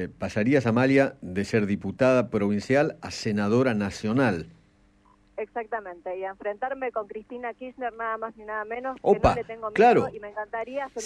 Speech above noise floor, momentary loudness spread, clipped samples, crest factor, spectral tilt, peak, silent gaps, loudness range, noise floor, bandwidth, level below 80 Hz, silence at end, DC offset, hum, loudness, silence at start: 35 dB; 13 LU; under 0.1%; 18 dB; -6.5 dB/octave; -6 dBFS; none; 9 LU; -60 dBFS; 10.5 kHz; -50 dBFS; 0 s; under 0.1%; none; -26 LUFS; 0 s